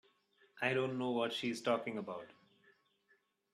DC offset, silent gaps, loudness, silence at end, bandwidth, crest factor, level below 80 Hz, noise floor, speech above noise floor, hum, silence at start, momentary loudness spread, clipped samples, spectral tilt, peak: under 0.1%; none; -38 LUFS; 1.2 s; 13.5 kHz; 20 dB; -84 dBFS; -76 dBFS; 39 dB; none; 0.55 s; 12 LU; under 0.1%; -5 dB/octave; -20 dBFS